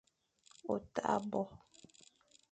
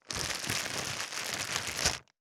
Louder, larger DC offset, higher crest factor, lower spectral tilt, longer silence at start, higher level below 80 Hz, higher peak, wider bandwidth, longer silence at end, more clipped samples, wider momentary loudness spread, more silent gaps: second, -39 LUFS vs -32 LUFS; neither; about the same, 24 dB vs 28 dB; first, -6 dB/octave vs -1 dB/octave; first, 0.65 s vs 0.05 s; second, -72 dBFS vs -56 dBFS; second, -18 dBFS vs -8 dBFS; second, 9 kHz vs over 20 kHz; first, 0.95 s vs 0.2 s; neither; first, 24 LU vs 4 LU; neither